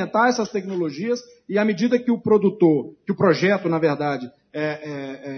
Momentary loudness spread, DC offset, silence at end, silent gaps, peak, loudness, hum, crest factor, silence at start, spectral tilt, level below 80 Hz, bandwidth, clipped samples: 11 LU; under 0.1%; 0 s; none; -4 dBFS; -21 LUFS; none; 16 dB; 0 s; -6.5 dB/octave; -70 dBFS; 6.6 kHz; under 0.1%